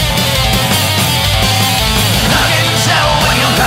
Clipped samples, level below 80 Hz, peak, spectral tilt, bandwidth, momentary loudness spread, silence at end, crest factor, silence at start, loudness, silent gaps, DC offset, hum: under 0.1%; -24 dBFS; 0 dBFS; -3 dB/octave; 16.5 kHz; 1 LU; 0 s; 12 dB; 0 s; -10 LUFS; none; under 0.1%; none